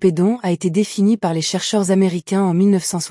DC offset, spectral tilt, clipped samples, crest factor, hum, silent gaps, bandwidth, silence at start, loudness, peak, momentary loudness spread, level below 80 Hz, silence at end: under 0.1%; -5.5 dB/octave; under 0.1%; 12 dB; none; none; 12 kHz; 0 s; -17 LUFS; -4 dBFS; 4 LU; -64 dBFS; 0 s